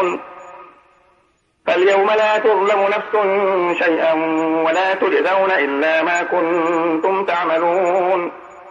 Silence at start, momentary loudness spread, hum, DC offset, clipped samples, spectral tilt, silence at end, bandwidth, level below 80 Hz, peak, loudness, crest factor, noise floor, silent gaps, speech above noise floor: 0 s; 6 LU; none; under 0.1%; under 0.1%; -4.5 dB/octave; 0 s; 7.4 kHz; -68 dBFS; -4 dBFS; -16 LUFS; 12 dB; -60 dBFS; none; 44 dB